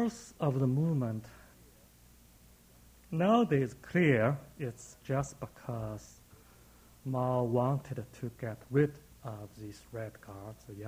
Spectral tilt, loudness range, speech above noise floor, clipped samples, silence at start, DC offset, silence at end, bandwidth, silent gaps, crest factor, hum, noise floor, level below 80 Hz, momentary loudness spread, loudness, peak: -7.5 dB/octave; 5 LU; 27 dB; under 0.1%; 0 s; under 0.1%; 0 s; 16 kHz; none; 20 dB; none; -60 dBFS; -62 dBFS; 20 LU; -33 LUFS; -14 dBFS